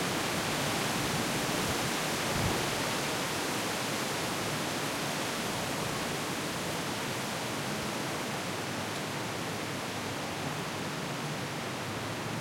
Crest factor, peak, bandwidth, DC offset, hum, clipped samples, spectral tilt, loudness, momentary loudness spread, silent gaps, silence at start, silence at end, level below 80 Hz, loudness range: 16 dB; -18 dBFS; 16.5 kHz; under 0.1%; none; under 0.1%; -3.5 dB/octave; -32 LUFS; 5 LU; none; 0 s; 0 s; -58 dBFS; 4 LU